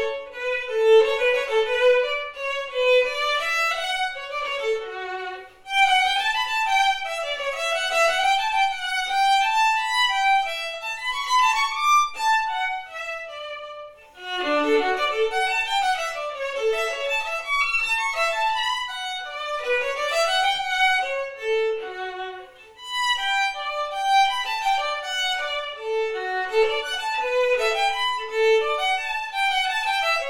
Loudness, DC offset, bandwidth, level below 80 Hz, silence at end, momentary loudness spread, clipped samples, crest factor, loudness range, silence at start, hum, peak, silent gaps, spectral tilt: -22 LUFS; under 0.1%; 17.5 kHz; -56 dBFS; 0 s; 10 LU; under 0.1%; 16 dB; 3 LU; 0 s; none; -8 dBFS; none; 0 dB/octave